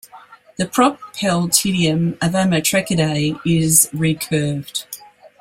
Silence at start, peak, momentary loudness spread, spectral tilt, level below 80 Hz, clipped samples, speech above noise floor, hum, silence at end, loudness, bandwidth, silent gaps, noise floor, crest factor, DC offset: 0.15 s; 0 dBFS; 13 LU; -4 dB/octave; -50 dBFS; under 0.1%; 21 dB; none; 0.15 s; -17 LUFS; 16.5 kHz; none; -38 dBFS; 18 dB; under 0.1%